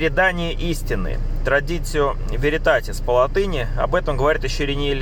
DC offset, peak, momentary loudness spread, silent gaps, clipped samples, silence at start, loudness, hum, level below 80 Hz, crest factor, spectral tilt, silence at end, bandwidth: under 0.1%; -4 dBFS; 7 LU; none; under 0.1%; 0 s; -21 LUFS; none; -24 dBFS; 16 dB; -5 dB/octave; 0 s; 17 kHz